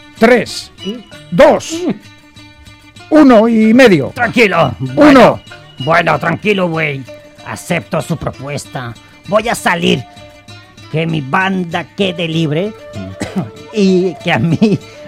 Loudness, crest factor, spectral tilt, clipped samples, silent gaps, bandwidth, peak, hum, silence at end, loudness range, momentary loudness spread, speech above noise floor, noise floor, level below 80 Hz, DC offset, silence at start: -12 LUFS; 12 dB; -6 dB/octave; under 0.1%; none; 16 kHz; 0 dBFS; none; 0 s; 9 LU; 18 LU; 27 dB; -39 dBFS; -44 dBFS; under 0.1%; 0.15 s